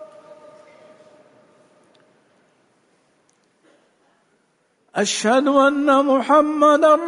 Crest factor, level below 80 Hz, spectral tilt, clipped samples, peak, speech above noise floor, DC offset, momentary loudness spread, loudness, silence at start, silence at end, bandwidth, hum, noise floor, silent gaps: 16 dB; -70 dBFS; -3.5 dB/octave; under 0.1%; -4 dBFS; 49 dB; under 0.1%; 7 LU; -16 LUFS; 0 s; 0 s; 11 kHz; none; -64 dBFS; none